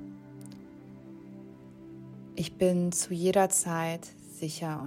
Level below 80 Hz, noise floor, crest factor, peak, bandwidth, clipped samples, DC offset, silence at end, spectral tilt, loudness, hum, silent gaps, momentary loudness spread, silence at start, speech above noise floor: -66 dBFS; -48 dBFS; 20 dB; -12 dBFS; 16 kHz; under 0.1%; under 0.1%; 0 s; -4.5 dB/octave; -29 LUFS; none; none; 23 LU; 0 s; 20 dB